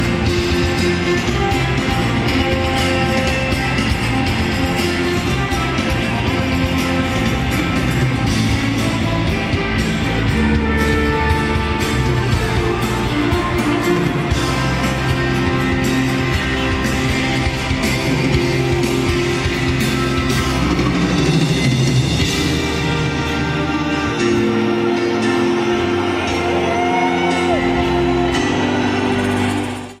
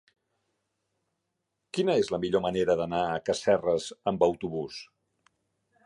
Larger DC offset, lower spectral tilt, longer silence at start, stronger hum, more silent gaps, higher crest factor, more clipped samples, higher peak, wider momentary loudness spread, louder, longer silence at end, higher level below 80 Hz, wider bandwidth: neither; about the same, -5.5 dB/octave vs -5.5 dB/octave; second, 0 s vs 1.75 s; neither; neither; second, 12 dB vs 20 dB; neither; first, -4 dBFS vs -10 dBFS; second, 2 LU vs 10 LU; first, -17 LUFS vs -28 LUFS; second, 0.05 s vs 1 s; first, -28 dBFS vs -60 dBFS; first, 16 kHz vs 11.5 kHz